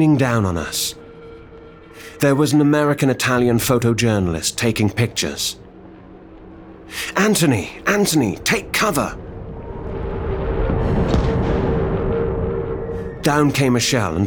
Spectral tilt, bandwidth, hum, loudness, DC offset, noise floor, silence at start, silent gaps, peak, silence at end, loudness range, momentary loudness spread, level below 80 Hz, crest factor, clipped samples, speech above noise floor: -5 dB/octave; over 20 kHz; none; -19 LUFS; under 0.1%; -40 dBFS; 0 s; none; -4 dBFS; 0 s; 4 LU; 15 LU; -32 dBFS; 16 dB; under 0.1%; 23 dB